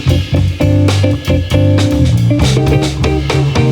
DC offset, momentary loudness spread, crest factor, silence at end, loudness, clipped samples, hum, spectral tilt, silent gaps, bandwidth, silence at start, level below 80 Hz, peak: under 0.1%; 3 LU; 10 dB; 0 s; -12 LUFS; under 0.1%; none; -6.5 dB/octave; none; 14 kHz; 0 s; -22 dBFS; 0 dBFS